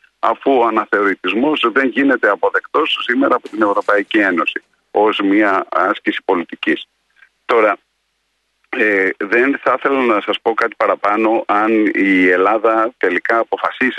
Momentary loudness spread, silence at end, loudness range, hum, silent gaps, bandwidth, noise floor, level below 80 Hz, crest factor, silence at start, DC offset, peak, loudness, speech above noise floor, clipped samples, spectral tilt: 6 LU; 0 s; 3 LU; none; none; 9.4 kHz; -67 dBFS; -66 dBFS; 14 dB; 0.25 s; under 0.1%; -2 dBFS; -15 LUFS; 52 dB; under 0.1%; -5.5 dB/octave